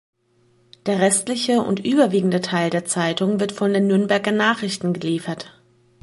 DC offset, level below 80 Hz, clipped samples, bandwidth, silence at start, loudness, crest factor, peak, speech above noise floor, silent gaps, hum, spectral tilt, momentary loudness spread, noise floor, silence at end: under 0.1%; -66 dBFS; under 0.1%; 11.5 kHz; 0.85 s; -20 LUFS; 18 dB; -4 dBFS; 40 dB; none; none; -4.5 dB/octave; 7 LU; -60 dBFS; 0.55 s